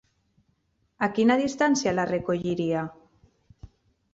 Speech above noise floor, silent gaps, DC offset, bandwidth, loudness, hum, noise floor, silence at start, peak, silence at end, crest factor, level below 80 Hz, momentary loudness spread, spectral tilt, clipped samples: 46 dB; none; under 0.1%; 8 kHz; -25 LUFS; none; -71 dBFS; 1 s; -10 dBFS; 0.45 s; 18 dB; -58 dBFS; 8 LU; -5 dB/octave; under 0.1%